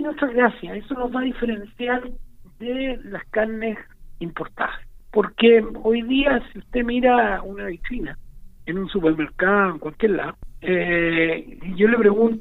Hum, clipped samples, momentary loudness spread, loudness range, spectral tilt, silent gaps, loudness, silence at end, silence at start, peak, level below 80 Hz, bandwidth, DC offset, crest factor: none; under 0.1%; 15 LU; 7 LU; -8 dB/octave; none; -21 LUFS; 0 s; 0 s; -2 dBFS; -40 dBFS; 4.1 kHz; under 0.1%; 20 dB